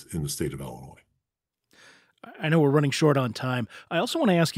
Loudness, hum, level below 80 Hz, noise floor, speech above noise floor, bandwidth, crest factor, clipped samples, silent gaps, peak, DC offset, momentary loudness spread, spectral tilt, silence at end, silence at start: -25 LUFS; none; -56 dBFS; -85 dBFS; 61 dB; 16 kHz; 20 dB; under 0.1%; none; -8 dBFS; under 0.1%; 12 LU; -5.5 dB/octave; 0 s; 0 s